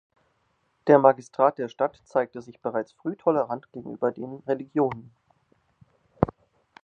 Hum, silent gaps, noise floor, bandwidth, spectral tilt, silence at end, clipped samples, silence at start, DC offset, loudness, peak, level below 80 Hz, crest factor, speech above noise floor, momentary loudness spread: none; none; -71 dBFS; 7.4 kHz; -8 dB/octave; 0.55 s; under 0.1%; 0.85 s; under 0.1%; -25 LUFS; -2 dBFS; -56 dBFS; 26 dB; 46 dB; 15 LU